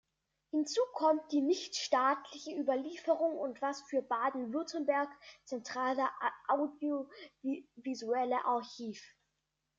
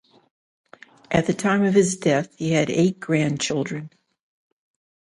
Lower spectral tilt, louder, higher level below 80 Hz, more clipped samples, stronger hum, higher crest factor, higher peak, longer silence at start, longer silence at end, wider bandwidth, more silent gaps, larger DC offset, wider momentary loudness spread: second, -3 dB/octave vs -5.5 dB/octave; second, -35 LUFS vs -21 LUFS; second, -84 dBFS vs -56 dBFS; neither; neither; about the same, 20 dB vs 18 dB; second, -16 dBFS vs -6 dBFS; second, 0.55 s vs 1.1 s; second, 0.7 s vs 1.15 s; second, 7.8 kHz vs 11.5 kHz; neither; neither; first, 12 LU vs 6 LU